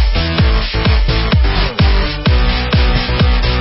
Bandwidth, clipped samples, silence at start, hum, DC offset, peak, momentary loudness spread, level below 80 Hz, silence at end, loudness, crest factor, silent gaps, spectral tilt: 5.8 kHz; under 0.1%; 0 s; none; under 0.1%; 0 dBFS; 1 LU; -14 dBFS; 0 s; -14 LUFS; 12 dB; none; -9.5 dB/octave